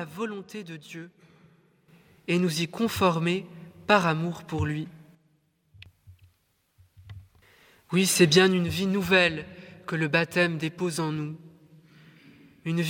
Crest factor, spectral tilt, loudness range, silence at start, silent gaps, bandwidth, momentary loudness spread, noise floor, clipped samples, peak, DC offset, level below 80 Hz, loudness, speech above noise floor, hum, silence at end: 22 dB; -4.5 dB/octave; 9 LU; 0 s; none; 17 kHz; 20 LU; -70 dBFS; under 0.1%; -6 dBFS; under 0.1%; -58 dBFS; -25 LUFS; 44 dB; none; 0 s